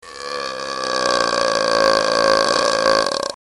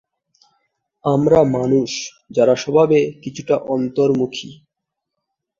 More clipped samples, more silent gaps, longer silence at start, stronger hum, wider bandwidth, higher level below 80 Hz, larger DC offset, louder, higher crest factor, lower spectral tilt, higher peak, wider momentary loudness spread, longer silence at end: neither; neither; second, 0.05 s vs 1.05 s; neither; first, 12 kHz vs 7.6 kHz; about the same, -50 dBFS vs -54 dBFS; neither; about the same, -17 LUFS vs -17 LUFS; about the same, 18 dB vs 16 dB; second, -1.5 dB/octave vs -6 dB/octave; about the same, 0 dBFS vs -2 dBFS; about the same, 10 LU vs 12 LU; second, 0.1 s vs 1.05 s